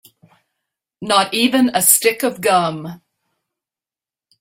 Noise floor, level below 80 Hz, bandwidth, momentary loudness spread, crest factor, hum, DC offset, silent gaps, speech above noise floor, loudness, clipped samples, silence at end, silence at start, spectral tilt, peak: under -90 dBFS; -64 dBFS; 16.5 kHz; 18 LU; 20 dB; none; under 0.1%; none; over 74 dB; -15 LUFS; under 0.1%; 1.45 s; 1 s; -2.5 dB/octave; 0 dBFS